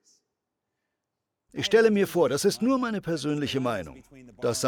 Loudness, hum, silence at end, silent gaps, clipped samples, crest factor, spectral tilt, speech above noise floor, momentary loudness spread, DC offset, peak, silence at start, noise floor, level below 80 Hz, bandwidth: -25 LUFS; none; 0 s; none; under 0.1%; 18 dB; -4.5 dB/octave; 59 dB; 11 LU; under 0.1%; -10 dBFS; 1.55 s; -84 dBFS; -62 dBFS; 19 kHz